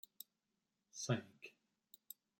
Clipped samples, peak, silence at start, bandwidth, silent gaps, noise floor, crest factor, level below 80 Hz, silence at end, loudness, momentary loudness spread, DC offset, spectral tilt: under 0.1%; -24 dBFS; 0.95 s; 16.5 kHz; none; -89 dBFS; 24 dB; -90 dBFS; 0.9 s; -45 LUFS; 21 LU; under 0.1%; -4.5 dB/octave